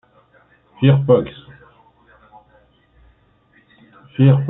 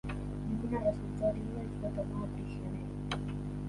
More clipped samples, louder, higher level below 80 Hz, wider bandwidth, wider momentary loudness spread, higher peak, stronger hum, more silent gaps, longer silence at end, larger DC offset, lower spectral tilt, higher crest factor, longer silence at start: neither; first, -16 LUFS vs -37 LUFS; second, -54 dBFS vs -46 dBFS; second, 3.9 kHz vs 11.5 kHz; first, 19 LU vs 6 LU; first, -2 dBFS vs -18 dBFS; second, none vs 50 Hz at -40 dBFS; neither; about the same, 0 s vs 0 s; neither; first, -12.5 dB/octave vs -8 dB/octave; about the same, 18 dB vs 18 dB; first, 0.8 s vs 0.05 s